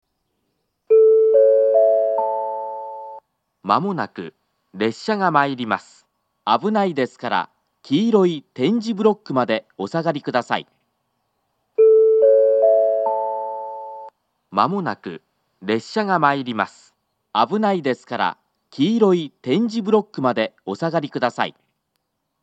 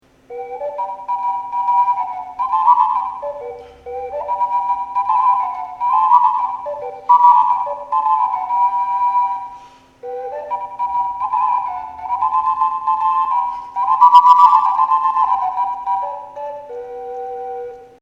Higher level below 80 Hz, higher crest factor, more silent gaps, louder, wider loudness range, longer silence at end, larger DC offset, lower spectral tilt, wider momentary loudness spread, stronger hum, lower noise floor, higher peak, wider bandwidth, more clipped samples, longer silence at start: second, -80 dBFS vs -58 dBFS; about the same, 20 dB vs 16 dB; neither; second, -19 LUFS vs -16 LUFS; about the same, 5 LU vs 7 LU; first, 0.95 s vs 0.15 s; neither; first, -6.5 dB/octave vs -3.5 dB/octave; about the same, 16 LU vs 18 LU; neither; first, -74 dBFS vs -41 dBFS; about the same, 0 dBFS vs 0 dBFS; first, 8.2 kHz vs 7.4 kHz; neither; first, 0.9 s vs 0.3 s